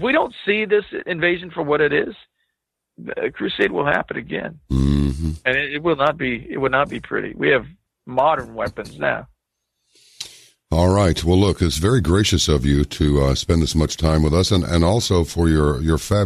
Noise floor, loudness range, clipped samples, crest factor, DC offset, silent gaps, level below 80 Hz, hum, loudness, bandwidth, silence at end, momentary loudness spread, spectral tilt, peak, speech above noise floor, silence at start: -78 dBFS; 5 LU; under 0.1%; 16 dB; under 0.1%; none; -30 dBFS; none; -19 LUFS; 13.5 kHz; 0 s; 9 LU; -5.5 dB/octave; -2 dBFS; 60 dB; 0 s